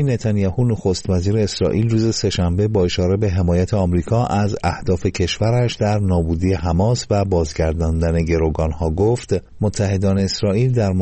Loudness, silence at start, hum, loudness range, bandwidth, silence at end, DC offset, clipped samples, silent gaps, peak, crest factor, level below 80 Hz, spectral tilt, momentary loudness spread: -19 LUFS; 0 s; none; 1 LU; 8.8 kHz; 0 s; under 0.1%; under 0.1%; none; -6 dBFS; 12 dB; -32 dBFS; -6.5 dB/octave; 3 LU